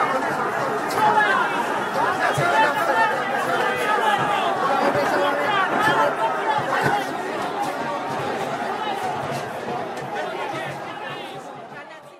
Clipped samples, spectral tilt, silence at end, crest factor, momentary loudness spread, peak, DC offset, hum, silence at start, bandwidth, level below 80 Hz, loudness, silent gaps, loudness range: under 0.1%; -4 dB/octave; 0 s; 16 dB; 11 LU; -6 dBFS; under 0.1%; none; 0 s; 16 kHz; -64 dBFS; -22 LUFS; none; 7 LU